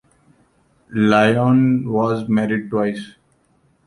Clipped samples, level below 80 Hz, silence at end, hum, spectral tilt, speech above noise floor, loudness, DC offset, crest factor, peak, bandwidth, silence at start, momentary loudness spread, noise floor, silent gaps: under 0.1%; -56 dBFS; 0.75 s; none; -7.5 dB/octave; 43 dB; -17 LUFS; under 0.1%; 16 dB; -2 dBFS; 11.5 kHz; 0.9 s; 12 LU; -60 dBFS; none